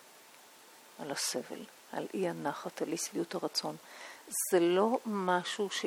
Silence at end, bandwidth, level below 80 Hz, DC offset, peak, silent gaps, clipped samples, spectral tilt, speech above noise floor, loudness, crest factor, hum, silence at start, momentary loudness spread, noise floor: 0 s; 18.5 kHz; -86 dBFS; under 0.1%; -16 dBFS; none; under 0.1%; -3.5 dB/octave; 23 dB; -34 LUFS; 20 dB; none; 0 s; 18 LU; -57 dBFS